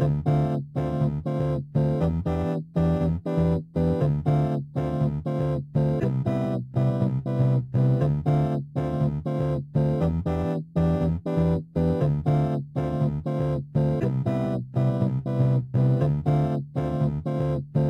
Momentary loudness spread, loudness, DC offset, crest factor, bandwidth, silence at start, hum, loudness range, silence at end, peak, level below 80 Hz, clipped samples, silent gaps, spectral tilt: 4 LU; -25 LUFS; under 0.1%; 14 dB; 5.4 kHz; 0 s; none; 1 LU; 0 s; -10 dBFS; -42 dBFS; under 0.1%; none; -10.5 dB/octave